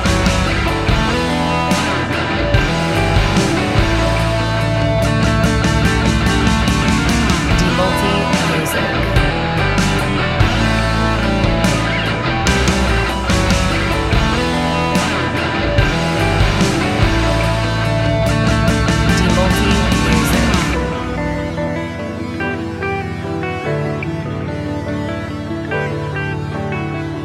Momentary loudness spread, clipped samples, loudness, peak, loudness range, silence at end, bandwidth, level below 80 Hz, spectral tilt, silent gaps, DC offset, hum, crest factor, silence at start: 7 LU; under 0.1%; -16 LUFS; 0 dBFS; 7 LU; 0 s; 15.5 kHz; -24 dBFS; -5 dB/octave; none; under 0.1%; none; 16 dB; 0 s